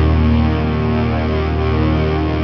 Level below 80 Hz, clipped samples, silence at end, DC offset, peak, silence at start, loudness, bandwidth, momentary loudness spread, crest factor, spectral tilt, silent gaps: -20 dBFS; under 0.1%; 0 s; under 0.1%; -4 dBFS; 0 s; -16 LUFS; 6 kHz; 3 LU; 10 dB; -9.5 dB/octave; none